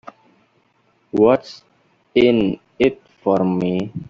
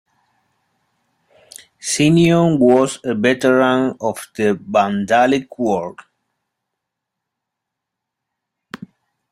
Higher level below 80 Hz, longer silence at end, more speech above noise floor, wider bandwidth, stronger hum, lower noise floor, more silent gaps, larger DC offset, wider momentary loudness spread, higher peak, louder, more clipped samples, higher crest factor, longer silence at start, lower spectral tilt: about the same, -54 dBFS vs -56 dBFS; second, 0.05 s vs 0.55 s; second, 44 dB vs 65 dB; second, 7.4 kHz vs 15 kHz; neither; second, -61 dBFS vs -81 dBFS; neither; neither; second, 9 LU vs 17 LU; about the same, -2 dBFS vs -2 dBFS; about the same, -18 LUFS vs -16 LUFS; neither; about the same, 18 dB vs 18 dB; second, 1.15 s vs 1.85 s; first, -8 dB/octave vs -5.5 dB/octave